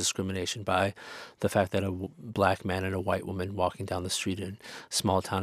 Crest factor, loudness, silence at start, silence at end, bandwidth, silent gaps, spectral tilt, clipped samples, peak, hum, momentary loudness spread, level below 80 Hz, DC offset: 22 dB; -30 LUFS; 0 s; 0 s; 15.5 kHz; none; -4 dB/octave; under 0.1%; -8 dBFS; none; 10 LU; -60 dBFS; under 0.1%